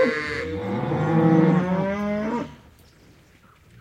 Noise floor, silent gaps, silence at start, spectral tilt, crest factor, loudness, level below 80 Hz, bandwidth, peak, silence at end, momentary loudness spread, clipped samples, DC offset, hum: -54 dBFS; none; 0 s; -8 dB/octave; 18 dB; -22 LUFS; -54 dBFS; 9.4 kHz; -6 dBFS; 1.25 s; 11 LU; under 0.1%; under 0.1%; none